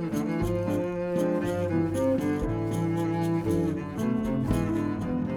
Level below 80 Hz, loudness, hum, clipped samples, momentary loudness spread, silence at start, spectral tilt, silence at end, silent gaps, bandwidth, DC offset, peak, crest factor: -44 dBFS; -28 LUFS; none; under 0.1%; 3 LU; 0 s; -8 dB/octave; 0 s; none; 18 kHz; under 0.1%; -12 dBFS; 16 dB